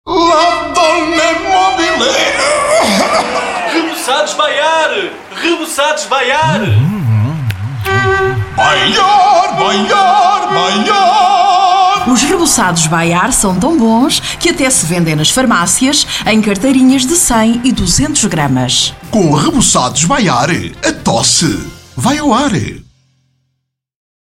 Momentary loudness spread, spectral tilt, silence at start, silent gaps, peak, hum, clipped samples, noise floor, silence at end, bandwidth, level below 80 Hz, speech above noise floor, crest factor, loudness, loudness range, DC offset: 6 LU; -3.5 dB/octave; 0.05 s; none; 0 dBFS; none; under 0.1%; -69 dBFS; 1.45 s; 16.5 kHz; -34 dBFS; 59 dB; 10 dB; -10 LUFS; 4 LU; 0.3%